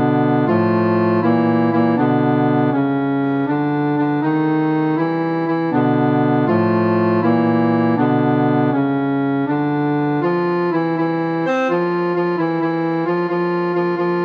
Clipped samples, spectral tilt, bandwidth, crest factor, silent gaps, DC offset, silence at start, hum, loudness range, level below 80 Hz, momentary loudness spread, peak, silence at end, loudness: under 0.1%; -9.5 dB/octave; 6.6 kHz; 12 dB; none; under 0.1%; 0 s; none; 2 LU; -64 dBFS; 3 LU; -4 dBFS; 0 s; -17 LUFS